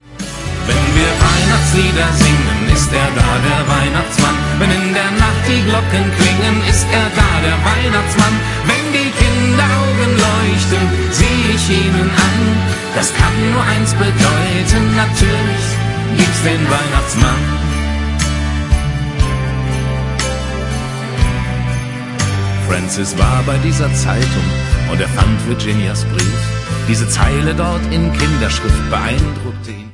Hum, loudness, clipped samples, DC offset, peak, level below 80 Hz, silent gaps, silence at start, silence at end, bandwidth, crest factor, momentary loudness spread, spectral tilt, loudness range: none; -14 LUFS; under 0.1%; under 0.1%; 0 dBFS; -22 dBFS; none; 0.1 s; 0 s; 11.5 kHz; 14 dB; 6 LU; -4.5 dB/octave; 5 LU